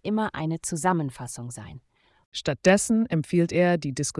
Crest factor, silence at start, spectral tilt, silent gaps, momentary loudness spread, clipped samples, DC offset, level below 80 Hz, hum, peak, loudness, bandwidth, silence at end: 16 dB; 0.05 s; -5 dB/octave; 2.25-2.32 s; 16 LU; under 0.1%; under 0.1%; -56 dBFS; none; -8 dBFS; -24 LUFS; 12 kHz; 0 s